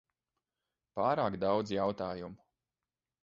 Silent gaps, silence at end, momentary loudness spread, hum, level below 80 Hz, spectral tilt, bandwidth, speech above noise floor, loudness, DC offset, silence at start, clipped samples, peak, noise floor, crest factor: none; 0.85 s; 13 LU; none; -66 dBFS; -5 dB/octave; 7.6 kHz; over 57 dB; -33 LUFS; under 0.1%; 0.95 s; under 0.1%; -16 dBFS; under -90 dBFS; 20 dB